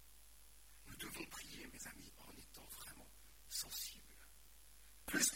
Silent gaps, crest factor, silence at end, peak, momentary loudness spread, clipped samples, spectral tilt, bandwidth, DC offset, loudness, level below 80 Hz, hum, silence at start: none; 28 dB; 0 s; -20 dBFS; 19 LU; under 0.1%; -1 dB/octave; 16.5 kHz; under 0.1%; -48 LUFS; -66 dBFS; none; 0 s